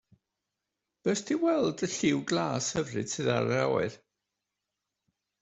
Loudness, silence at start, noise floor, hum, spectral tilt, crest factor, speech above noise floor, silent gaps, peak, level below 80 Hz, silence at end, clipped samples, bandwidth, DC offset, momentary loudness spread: -29 LUFS; 1.05 s; -86 dBFS; none; -4.5 dB/octave; 20 dB; 58 dB; none; -12 dBFS; -66 dBFS; 1.45 s; under 0.1%; 8.2 kHz; under 0.1%; 5 LU